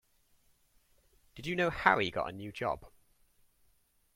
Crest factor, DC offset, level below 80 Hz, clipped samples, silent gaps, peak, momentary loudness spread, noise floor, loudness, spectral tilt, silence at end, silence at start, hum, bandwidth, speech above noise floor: 28 dB; under 0.1%; -60 dBFS; under 0.1%; none; -10 dBFS; 13 LU; -71 dBFS; -32 LUFS; -5.5 dB/octave; 1.25 s; 1.35 s; none; 16.5 kHz; 38 dB